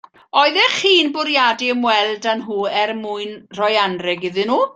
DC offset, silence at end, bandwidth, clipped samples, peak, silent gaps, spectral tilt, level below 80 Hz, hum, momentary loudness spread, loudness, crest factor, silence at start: under 0.1%; 0.05 s; 9.2 kHz; under 0.1%; 0 dBFS; none; -3 dB/octave; -66 dBFS; none; 8 LU; -17 LUFS; 18 dB; 0.35 s